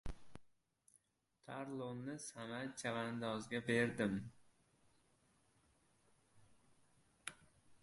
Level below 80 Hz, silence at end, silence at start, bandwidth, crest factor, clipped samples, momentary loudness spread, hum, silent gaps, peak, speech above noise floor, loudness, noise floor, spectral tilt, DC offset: -64 dBFS; 0.05 s; 0.05 s; 11.5 kHz; 24 dB; under 0.1%; 16 LU; none; none; -22 dBFS; 37 dB; -43 LUFS; -79 dBFS; -5 dB/octave; under 0.1%